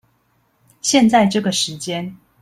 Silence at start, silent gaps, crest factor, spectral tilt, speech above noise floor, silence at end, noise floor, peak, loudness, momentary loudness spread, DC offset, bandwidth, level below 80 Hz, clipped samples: 0.85 s; none; 18 dB; -3.5 dB/octave; 46 dB; 0.25 s; -62 dBFS; -2 dBFS; -17 LUFS; 13 LU; under 0.1%; 14.5 kHz; -58 dBFS; under 0.1%